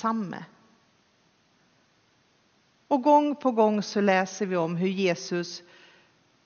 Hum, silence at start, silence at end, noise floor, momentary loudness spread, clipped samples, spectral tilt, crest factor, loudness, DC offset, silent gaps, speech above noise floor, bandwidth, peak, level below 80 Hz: none; 0 s; 0.85 s; -65 dBFS; 14 LU; under 0.1%; -4.5 dB/octave; 20 dB; -25 LUFS; under 0.1%; none; 40 dB; 6.8 kHz; -8 dBFS; -80 dBFS